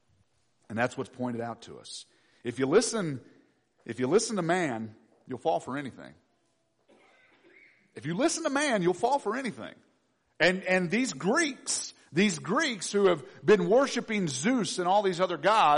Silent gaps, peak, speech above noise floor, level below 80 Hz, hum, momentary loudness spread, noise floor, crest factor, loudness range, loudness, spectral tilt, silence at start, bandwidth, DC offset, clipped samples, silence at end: none; -12 dBFS; 46 dB; -70 dBFS; none; 17 LU; -73 dBFS; 16 dB; 8 LU; -28 LUFS; -4 dB/octave; 0.7 s; 10.5 kHz; under 0.1%; under 0.1%; 0 s